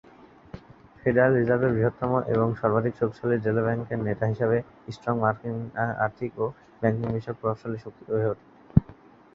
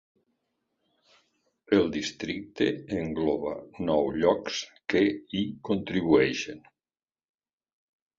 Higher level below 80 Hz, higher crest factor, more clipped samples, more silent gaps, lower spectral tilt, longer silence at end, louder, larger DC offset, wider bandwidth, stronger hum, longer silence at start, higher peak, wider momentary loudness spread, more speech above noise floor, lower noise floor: first, -48 dBFS vs -58 dBFS; about the same, 24 dB vs 22 dB; neither; neither; first, -10 dB/octave vs -5.5 dB/octave; second, 0.4 s vs 1.6 s; about the same, -26 LUFS vs -28 LUFS; neither; second, 6.8 kHz vs 7.6 kHz; neither; second, 0.55 s vs 1.7 s; first, -2 dBFS vs -8 dBFS; about the same, 12 LU vs 11 LU; second, 26 dB vs over 63 dB; second, -52 dBFS vs under -90 dBFS